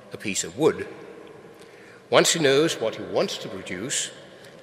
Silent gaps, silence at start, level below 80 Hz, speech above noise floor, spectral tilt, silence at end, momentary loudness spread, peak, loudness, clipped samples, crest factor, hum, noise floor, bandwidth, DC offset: none; 0 s; -72 dBFS; 23 dB; -3 dB/octave; 0 s; 21 LU; 0 dBFS; -24 LUFS; under 0.1%; 26 dB; none; -47 dBFS; 16 kHz; under 0.1%